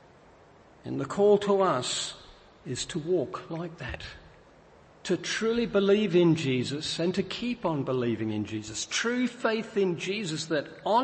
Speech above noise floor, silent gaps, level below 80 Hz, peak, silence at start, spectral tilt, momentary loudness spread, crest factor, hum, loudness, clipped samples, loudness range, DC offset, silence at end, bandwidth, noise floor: 28 dB; none; -58 dBFS; -10 dBFS; 0.85 s; -5 dB/octave; 14 LU; 18 dB; none; -28 LUFS; under 0.1%; 6 LU; under 0.1%; 0 s; 8.8 kHz; -55 dBFS